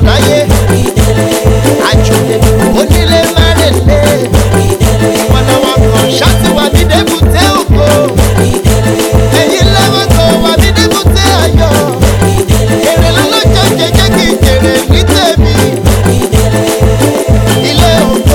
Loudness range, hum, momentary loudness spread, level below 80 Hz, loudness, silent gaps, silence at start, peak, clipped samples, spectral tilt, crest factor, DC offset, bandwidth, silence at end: 1 LU; none; 2 LU; -14 dBFS; -7 LUFS; none; 0 s; 0 dBFS; 2%; -5 dB/octave; 6 dB; under 0.1%; 18.5 kHz; 0 s